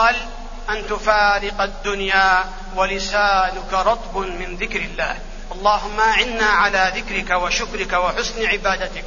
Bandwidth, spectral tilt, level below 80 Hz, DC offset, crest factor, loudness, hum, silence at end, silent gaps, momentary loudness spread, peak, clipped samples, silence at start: 7.4 kHz; -2.5 dB/octave; -32 dBFS; under 0.1%; 18 dB; -19 LUFS; none; 0 s; none; 10 LU; -2 dBFS; under 0.1%; 0 s